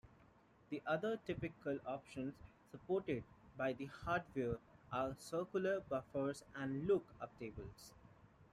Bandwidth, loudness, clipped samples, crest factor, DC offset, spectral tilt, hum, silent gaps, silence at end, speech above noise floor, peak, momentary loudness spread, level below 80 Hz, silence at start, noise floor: 14.5 kHz; -43 LUFS; under 0.1%; 18 dB; under 0.1%; -6.5 dB/octave; none; none; 0.1 s; 26 dB; -26 dBFS; 14 LU; -68 dBFS; 0.05 s; -69 dBFS